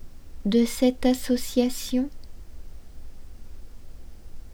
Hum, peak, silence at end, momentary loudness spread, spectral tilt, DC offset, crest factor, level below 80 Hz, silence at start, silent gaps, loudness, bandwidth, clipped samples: none; -8 dBFS; 0 s; 7 LU; -5 dB/octave; under 0.1%; 18 dB; -40 dBFS; 0 s; none; -25 LUFS; 18 kHz; under 0.1%